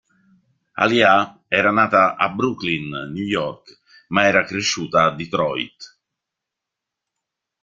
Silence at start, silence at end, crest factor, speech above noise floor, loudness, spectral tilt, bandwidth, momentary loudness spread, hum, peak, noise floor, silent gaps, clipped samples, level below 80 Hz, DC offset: 0.75 s; 1.75 s; 20 dB; 65 dB; -18 LUFS; -4 dB/octave; 9.2 kHz; 12 LU; none; -2 dBFS; -84 dBFS; none; under 0.1%; -58 dBFS; under 0.1%